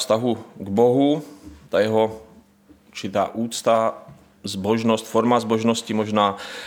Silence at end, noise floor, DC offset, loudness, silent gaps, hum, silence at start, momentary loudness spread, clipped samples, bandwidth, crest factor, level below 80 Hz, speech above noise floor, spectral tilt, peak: 0 s; -53 dBFS; under 0.1%; -21 LUFS; none; none; 0 s; 13 LU; under 0.1%; 18 kHz; 18 dB; -60 dBFS; 32 dB; -5 dB/octave; -4 dBFS